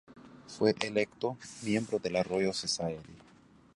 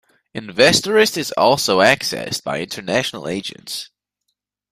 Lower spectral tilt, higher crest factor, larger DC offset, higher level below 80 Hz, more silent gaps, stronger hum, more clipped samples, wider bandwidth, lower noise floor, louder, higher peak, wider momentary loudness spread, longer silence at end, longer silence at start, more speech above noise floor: first, -4.5 dB/octave vs -3 dB/octave; about the same, 22 dB vs 18 dB; neither; second, -66 dBFS vs -56 dBFS; neither; second, none vs 50 Hz at -50 dBFS; neither; second, 11.5 kHz vs 16 kHz; second, -60 dBFS vs -75 dBFS; second, -32 LUFS vs -17 LUFS; second, -12 dBFS vs 0 dBFS; second, 11 LU vs 15 LU; second, 0.6 s vs 0.85 s; second, 0.1 s vs 0.35 s; second, 28 dB vs 58 dB